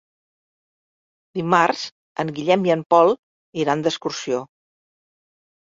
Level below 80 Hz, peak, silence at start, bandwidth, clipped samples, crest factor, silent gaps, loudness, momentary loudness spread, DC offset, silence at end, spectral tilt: -66 dBFS; -2 dBFS; 1.35 s; 7.8 kHz; under 0.1%; 20 dB; 1.92-2.15 s, 2.86-2.90 s, 3.19-3.53 s; -20 LUFS; 13 LU; under 0.1%; 1.2 s; -5 dB/octave